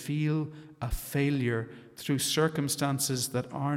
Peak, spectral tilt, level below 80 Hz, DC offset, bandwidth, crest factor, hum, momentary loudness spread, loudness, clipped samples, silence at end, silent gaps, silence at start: -14 dBFS; -4.5 dB/octave; -46 dBFS; under 0.1%; 16.5 kHz; 16 dB; none; 11 LU; -30 LUFS; under 0.1%; 0 s; none; 0 s